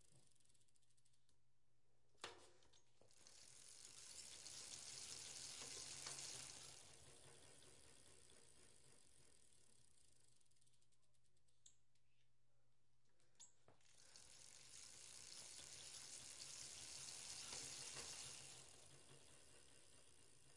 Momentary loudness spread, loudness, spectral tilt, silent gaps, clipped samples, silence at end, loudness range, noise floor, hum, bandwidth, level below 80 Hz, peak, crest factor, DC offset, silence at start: 16 LU; -56 LUFS; 0 dB/octave; none; under 0.1%; 0 s; 13 LU; -87 dBFS; none; 12 kHz; -86 dBFS; -36 dBFS; 24 dB; under 0.1%; 0 s